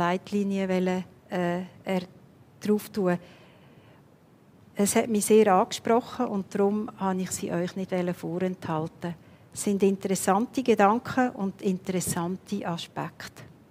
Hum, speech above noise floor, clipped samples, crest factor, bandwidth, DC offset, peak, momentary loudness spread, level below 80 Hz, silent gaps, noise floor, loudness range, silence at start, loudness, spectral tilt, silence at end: none; 30 dB; under 0.1%; 22 dB; 16 kHz; under 0.1%; -6 dBFS; 13 LU; -66 dBFS; none; -57 dBFS; 6 LU; 0 s; -27 LUFS; -5.5 dB/octave; 0.25 s